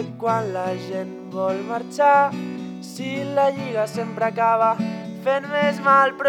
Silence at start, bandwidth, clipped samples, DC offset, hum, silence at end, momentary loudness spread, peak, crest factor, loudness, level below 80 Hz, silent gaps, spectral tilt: 0 s; 17 kHz; under 0.1%; under 0.1%; none; 0 s; 14 LU; -4 dBFS; 18 dB; -22 LUFS; -74 dBFS; none; -6 dB/octave